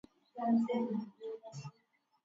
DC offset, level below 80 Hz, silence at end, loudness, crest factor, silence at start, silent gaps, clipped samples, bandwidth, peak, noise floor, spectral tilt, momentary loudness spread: under 0.1%; -86 dBFS; 0.55 s; -36 LUFS; 16 dB; 0.35 s; none; under 0.1%; 7.6 kHz; -22 dBFS; -76 dBFS; -7 dB/octave; 19 LU